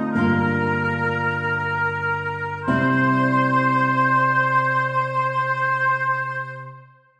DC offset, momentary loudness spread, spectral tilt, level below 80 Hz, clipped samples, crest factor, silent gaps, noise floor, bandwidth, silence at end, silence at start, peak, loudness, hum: under 0.1%; 8 LU; -7.5 dB/octave; -60 dBFS; under 0.1%; 14 dB; none; -44 dBFS; 9.8 kHz; 0.35 s; 0 s; -8 dBFS; -20 LUFS; none